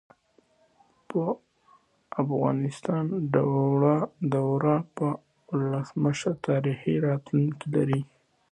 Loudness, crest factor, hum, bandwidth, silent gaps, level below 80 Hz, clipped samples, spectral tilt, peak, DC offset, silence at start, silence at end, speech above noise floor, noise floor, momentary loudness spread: -27 LUFS; 20 dB; none; 9.6 kHz; none; -66 dBFS; under 0.1%; -8 dB/octave; -8 dBFS; under 0.1%; 1.1 s; 0.45 s; 39 dB; -65 dBFS; 7 LU